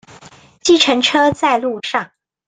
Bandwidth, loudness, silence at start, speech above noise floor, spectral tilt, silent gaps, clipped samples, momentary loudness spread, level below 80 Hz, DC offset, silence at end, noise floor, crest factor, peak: 9.6 kHz; -14 LUFS; 0.25 s; 29 dB; -2.5 dB/octave; none; under 0.1%; 10 LU; -54 dBFS; under 0.1%; 0.4 s; -43 dBFS; 16 dB; 0 dBFS